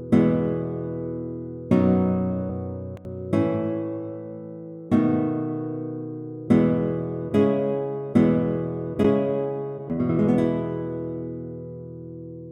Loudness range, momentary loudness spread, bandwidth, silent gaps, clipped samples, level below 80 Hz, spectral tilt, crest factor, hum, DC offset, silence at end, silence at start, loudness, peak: 4 LU; 16 LU; 8.8 kHz; none; under 0.1%; -52 dBFS; -10 dB/octave; 18 dB; none; under 0.1%; 0 s; 0 s; -24 LUFS; -6 dBFS